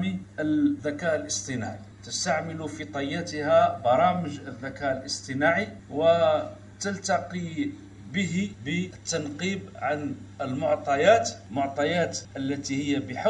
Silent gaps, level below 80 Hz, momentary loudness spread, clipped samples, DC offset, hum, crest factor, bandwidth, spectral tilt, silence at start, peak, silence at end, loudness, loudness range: none; -60 dBFS; 12 LU; under 0.1%; under 0.1%; none; 20 dB; 11 kHz; -4.5 dB/octave; 0 s; -8 dBFS; 0 s; -27 LUFS; 5 LU